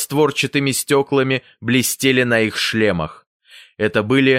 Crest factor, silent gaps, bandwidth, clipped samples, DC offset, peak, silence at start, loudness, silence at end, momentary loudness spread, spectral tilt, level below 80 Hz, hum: 16 dB; 3.27-3.40 s; 16 kHz; under 0.1%; under 0.1%; -2 dBFS; 0 s; -17 LUFS; 0 s; 6 LU; -4 dB/octave; -52 dBFS; none